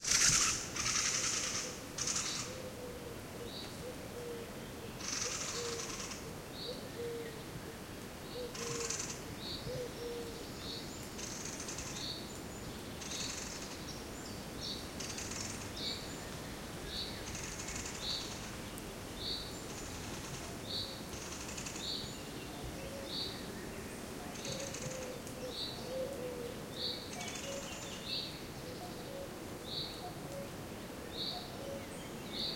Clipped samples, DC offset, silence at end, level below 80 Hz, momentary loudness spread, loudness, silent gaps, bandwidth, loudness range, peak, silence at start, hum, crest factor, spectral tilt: under 0.1%; under 0.1%; 0 s; -58 dBFS; 10 LU; -40 LUFS; none; 16.5 kHz; 2 LU; -14 dBFS; 0 s; none; 28 dB; -2 dB/octave